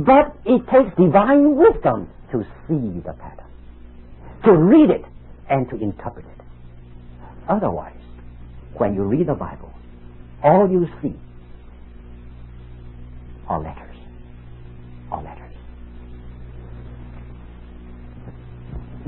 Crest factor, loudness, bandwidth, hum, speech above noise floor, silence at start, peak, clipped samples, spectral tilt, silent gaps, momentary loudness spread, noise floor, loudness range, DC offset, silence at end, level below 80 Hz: 20 dB; -18 LUFS; 4.1 kHz; none; 23 dB; 0 s; -2 dBFS; under 0.1%; -13 dB/octave; none; 27 LU; -40 dBFS; 19 LU; under 0.1%; 0 s; -40 dBFS